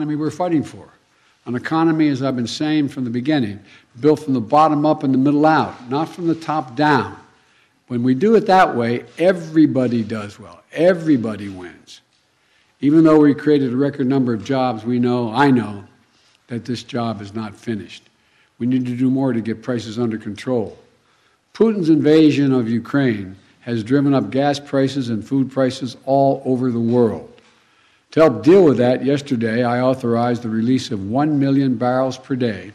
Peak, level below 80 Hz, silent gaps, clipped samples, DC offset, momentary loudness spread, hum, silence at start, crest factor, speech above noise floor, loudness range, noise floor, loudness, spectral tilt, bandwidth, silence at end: -4 dBFS; -62 dBFS; none; under 0.1%; under 0.1%; 13 LU; none; 0 s; 14 dB; 43 dB; 6 LU; -60 dBFS; -18 LUFS; -7.5 dB/octave; 11 kHz; 0.05 s